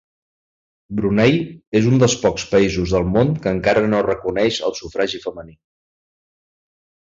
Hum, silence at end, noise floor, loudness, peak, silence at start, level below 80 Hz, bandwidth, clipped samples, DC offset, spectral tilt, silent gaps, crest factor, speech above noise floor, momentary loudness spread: none; 1.6 s; under -90 dBFS; -18 LUFS; -2 dBFS; 0.9 s; -42 dBFS; 7.8 kHz; under 0.1%; under 0.1%; -5.5 dB/octave; 1.67-1.72 s; 18 dB; over 72 dB; 8 LU